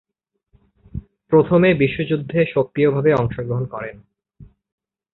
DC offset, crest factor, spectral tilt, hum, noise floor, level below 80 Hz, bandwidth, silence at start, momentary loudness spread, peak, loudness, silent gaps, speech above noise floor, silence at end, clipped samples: under 0.1%; 18 dB; -10 dB/octave; none; -70 dBFS; -46 dBFS; 4.2 kHz; 0.95 s; 20 LU; -2 dBFS; -18 LUFS; none; 52 dB; 0.7 s; under 0.1%